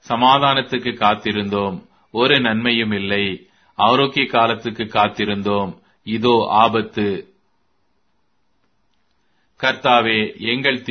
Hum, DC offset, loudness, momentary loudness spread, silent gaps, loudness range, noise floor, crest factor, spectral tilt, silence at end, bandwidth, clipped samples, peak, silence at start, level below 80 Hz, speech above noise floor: none; under 0.1%; -17 LUFS; 11 LU; none; 5 LU; -69 dBFS; 18 dB; -6 dB/octave; 0 s; 6.6 kHz; under 0.1%; 0 dBFS; 0.1 s; -56 dBFS; 51 dB